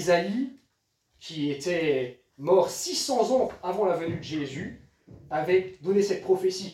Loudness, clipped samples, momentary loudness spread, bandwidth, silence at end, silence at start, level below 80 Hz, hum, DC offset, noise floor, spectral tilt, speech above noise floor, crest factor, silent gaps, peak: -27 LUFS; under 0.1%; 12 LU; 15.5 kHz; 0 s; 0 s; -64 dBFS; none; under 0.1%; -74 dBFS; -4.5 dB/octave; 47 dB; 18 dB; none; -10 dBFS